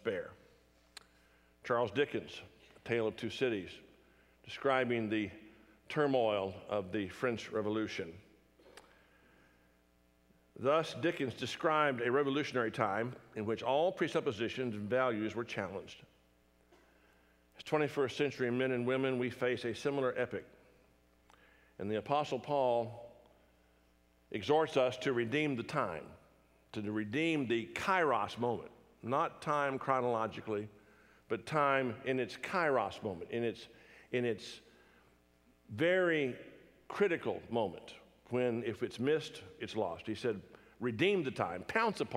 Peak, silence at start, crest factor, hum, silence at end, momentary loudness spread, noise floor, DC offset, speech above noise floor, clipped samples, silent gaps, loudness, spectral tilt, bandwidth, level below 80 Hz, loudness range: -14 dBFS; 0.05 s; 22 dB; none; 0 s; 15 LU; -70 dBFS; under 0.1%; 35 dB; under 0.1%; none; -35 LUFS; -6 dB/octave; 15 kHz; -74 dBFS; 5 LU